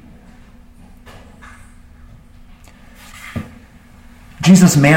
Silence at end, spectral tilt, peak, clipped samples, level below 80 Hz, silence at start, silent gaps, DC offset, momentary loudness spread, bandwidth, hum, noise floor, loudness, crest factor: 0 s; -5.5 dB/octave; 0 dBFS; under 0.1%; -42 dBFS; 3.25 s; none; under 0.1%; 28 LU; 16.5 kHz; none; -42 dBFS; -12 LUFS; 18 dB